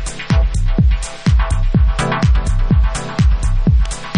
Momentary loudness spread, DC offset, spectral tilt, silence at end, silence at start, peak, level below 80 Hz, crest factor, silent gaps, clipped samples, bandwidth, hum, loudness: 2 LU; under 0.1%; -6 dB/octave; 0 s; 0 s; -2 dBFS; -16 dBFS; 12 dB; none; under 0.1%; 11 kHz; none; -16 LUFS